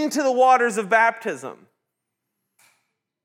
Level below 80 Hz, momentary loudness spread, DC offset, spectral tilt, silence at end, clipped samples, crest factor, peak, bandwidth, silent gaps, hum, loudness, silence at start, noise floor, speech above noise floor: under -90 dBFS; 16 LU; under 0.1%; -3.5 dB/octave; 1.75 s; under 0.1%; 18 dB; -4 dBFS; 16 kHz; none; none; -19 LUFS; 0 s; -81 dBFS; 61 dB